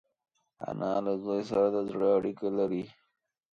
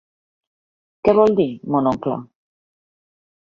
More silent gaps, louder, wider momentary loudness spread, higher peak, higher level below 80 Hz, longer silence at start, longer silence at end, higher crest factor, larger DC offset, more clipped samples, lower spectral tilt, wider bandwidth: neither; second, -30 LUFS vs -18 LUFS; about the same, 11 LU vs 11 LU; second, -14 dBFS vs -2 dBFS; second, -68 dBFS vs -54 dBFS; second, 0.6 s vs 1.05 s; second, 0.6 s vs 1.2 s; about the same, 16 dB vs 20 dB; neither; neither; about the same, -8 dB/octave vs -8.5 dB/octave; about the same, 7 kHz vs 7.2 kHz